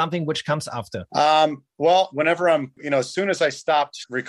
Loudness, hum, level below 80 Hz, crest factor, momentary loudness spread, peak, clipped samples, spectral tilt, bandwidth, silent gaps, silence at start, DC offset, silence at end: -21 LUFS; none; -66 dBFS; 16 dB; 8 LU; -6 dBFS; under 0.1%; -4.5 dB/octave; 12 kHz; none; 0 s; under 0.1%; 0 s